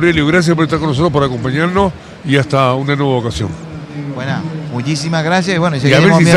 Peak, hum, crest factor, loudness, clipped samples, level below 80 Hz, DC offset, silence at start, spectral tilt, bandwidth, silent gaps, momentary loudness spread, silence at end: 0 dBFS; none; 12 dB; -14 LUFS; 0.1%; -38 dBFS; under 0.1%; 0 s; -6 dB/octave; 11.5 kHz; none; 11 LU; 0 s